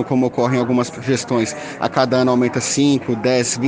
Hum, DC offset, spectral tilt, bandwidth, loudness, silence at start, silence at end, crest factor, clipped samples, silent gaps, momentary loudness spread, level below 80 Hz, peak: none; under 0.1%; -5 dB/octave; 10 kHz; -18 LUFS; 0 s; 0 s; 16 dB; under 0.1%; none; 5 LU; -56 dBFS; -2 dBFS